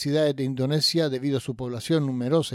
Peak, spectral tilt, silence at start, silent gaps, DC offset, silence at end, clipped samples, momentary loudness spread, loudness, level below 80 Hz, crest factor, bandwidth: -12 dBFS; -5.5 dB/octave; 0 s; none; under 0.1%; 0 s; under 0.1%; 7 LU; -25 LUFS; -62 dBFS; 12 dB; 16 kHz